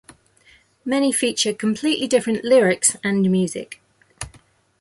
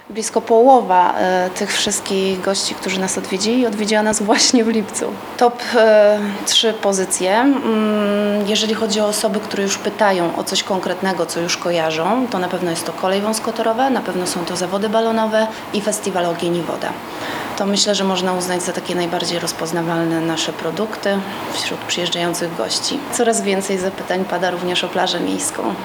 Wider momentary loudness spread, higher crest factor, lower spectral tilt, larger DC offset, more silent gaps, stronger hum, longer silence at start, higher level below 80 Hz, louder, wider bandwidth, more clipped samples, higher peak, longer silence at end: first, 19 LU vs 8 LU; about the same, 18 dB vs 18 dB; about the same, -4 dB/octave vs -3.5 dB/octave; neither; neither; neither; first, 0.85 s vs 0.1 s; about the same, -56 dBFS vs -58 dBFS; about the same, -19 LUFS vs -17 LUFS; second, 12 kHz vs over 20 kHz; neither; about the same, -2 dBFS vs 0 dBFS; first, 0.55 s vs 0 s